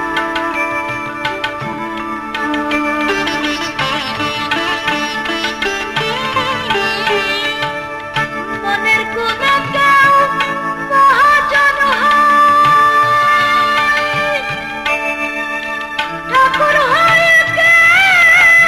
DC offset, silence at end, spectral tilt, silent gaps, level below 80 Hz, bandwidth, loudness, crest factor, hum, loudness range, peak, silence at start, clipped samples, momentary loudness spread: under 0.1%; 0 s; -3 dB/octave; none; -44 dBFS; 14 kHz; -12 LUFS; 12 dB; none; 7 LU; -2 dBFS; 0 s; under 0.1%; 11 LU